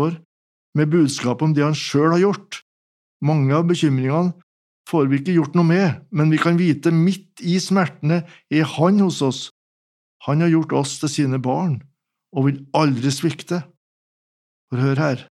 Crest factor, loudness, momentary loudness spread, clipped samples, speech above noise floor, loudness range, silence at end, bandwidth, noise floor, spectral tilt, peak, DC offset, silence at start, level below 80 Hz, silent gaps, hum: 18 dB; -19 LUFS; 10 LU; under 0.1%; over 72 dB; 4 LU; 0.1 s; 12.5 kHz; under -90 dBFS; -6.5 dB/octave; -2 dBFS; under 0.1%; 0 s; -76 dBFS; 0.25-0.73 s, 2.62-3.20 s, 4.43-4.85 s, 9.51-10.20 s, 13.77-14.68 s; none